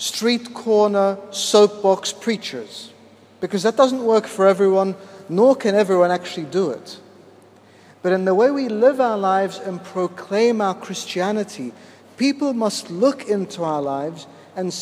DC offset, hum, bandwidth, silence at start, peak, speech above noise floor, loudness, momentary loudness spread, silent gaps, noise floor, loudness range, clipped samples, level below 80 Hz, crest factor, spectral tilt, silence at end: under 0.1%; none; 15 kHz; 0 s; -2 dBFS; 29 dB; -19 LUFS; 14 LU; none; -48 dBFS; 5 LU; under 0.1%; -76 dBFS; 18 dB; -4.5 dB/octave; 0 s